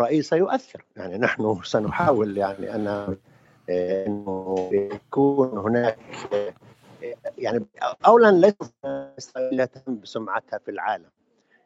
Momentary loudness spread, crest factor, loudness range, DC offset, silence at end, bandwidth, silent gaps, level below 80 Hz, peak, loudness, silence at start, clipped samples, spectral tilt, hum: 16 LU; 22 dB; 4 LU; under 0.1%; 0.7 s; 8 kHz; none; -62 dBFS; -2 dBFS; -23 LUFS; 0 s; under 0.1%; -6.5 dB/octave; none